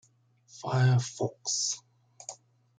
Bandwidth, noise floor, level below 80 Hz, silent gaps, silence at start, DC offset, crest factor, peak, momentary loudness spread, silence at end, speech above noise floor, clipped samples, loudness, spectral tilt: 9.4 kHz; -64 dBFS; -70 dBFS; none; 0.55 s; under 0.1%; 18 dB; -14 dBFS; 19 LU; 0.45 s; 36 dB; under 0.1%; -29 LUFS; -4 dB/octave